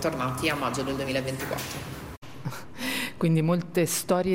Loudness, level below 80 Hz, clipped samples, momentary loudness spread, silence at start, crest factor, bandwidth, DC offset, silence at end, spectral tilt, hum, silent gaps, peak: -28 LUFS; -52 dBFS; under 0.1%; 13 LU; 0 s; 16 dB; 16.5 kHz; under 0.1%; 0 s; -5 dB/octave; none; 2.17-2.22 s; -10 dBFS